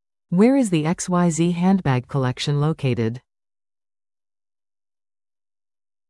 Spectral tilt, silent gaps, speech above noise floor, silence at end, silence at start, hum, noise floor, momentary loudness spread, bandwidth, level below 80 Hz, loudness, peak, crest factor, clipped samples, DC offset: -6.5 dB/octave; none; over 71 dB; 2.9 s; 0.3 s; none; under -90 dBFS; 8 LU; 12 kHz; -56 dBFS; -20 LUFS; -4 dBFS; 18 dB; under 0.1%; under 0.1%